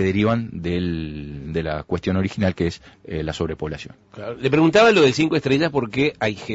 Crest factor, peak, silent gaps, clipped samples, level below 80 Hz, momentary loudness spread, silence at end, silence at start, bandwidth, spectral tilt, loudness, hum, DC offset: 14 dB; -6 dBFS; none; under 0.1%; -44 dBFS; 18 LU; 0 s; 0 s; 8 kHz; -6 dB/octave; -20 LUFS; none; under 0.1%